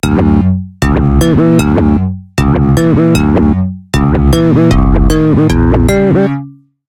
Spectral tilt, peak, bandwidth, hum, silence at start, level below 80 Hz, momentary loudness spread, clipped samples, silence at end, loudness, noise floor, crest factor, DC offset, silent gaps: -7.5 dB/octave; 0 dBFS; 16.5 kHz; none; 0.05 s; -16 dBFS; 6 LU; under 0.1%; 0.35 s; -10 LUFS; -28 dBFS; 8 dB; under 0.1%; none